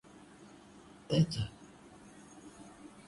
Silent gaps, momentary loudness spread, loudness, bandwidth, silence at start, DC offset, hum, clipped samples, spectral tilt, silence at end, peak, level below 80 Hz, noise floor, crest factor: none; 25 LU; -34 LUFS; 11.5 kHz; 0.4 s; under 0.1%; none; under 0.1%; -6.5 dB/octave; 0.05 s; -16 dBFS; -62 dBFS; -56 dBFS; 22 dB